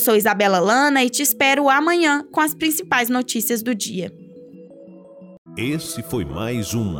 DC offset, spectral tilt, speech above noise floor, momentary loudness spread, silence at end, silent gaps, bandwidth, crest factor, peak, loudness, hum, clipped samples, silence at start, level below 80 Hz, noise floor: under 0.1%; -3.5 dB/octave; 23 dB; 11 LU; 0 s; 5.38-5.45 s; over 20 kHz; 16 dB; -4 dBFS; -18 LUFS; none; under 0.1%; 0 s; -52 dBFS; -42 dBFS